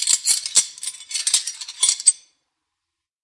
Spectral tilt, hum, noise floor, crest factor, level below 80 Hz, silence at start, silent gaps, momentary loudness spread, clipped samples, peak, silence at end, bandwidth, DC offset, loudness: 4.5 dB/octave; none; -82 dBFS; 22 dB; -82 dBFS; 0 s; none; 14 LU; under 0.1%; 0 dBFS; 1.05 s; 11.5 kHz; under 0.1%; -18 LUFS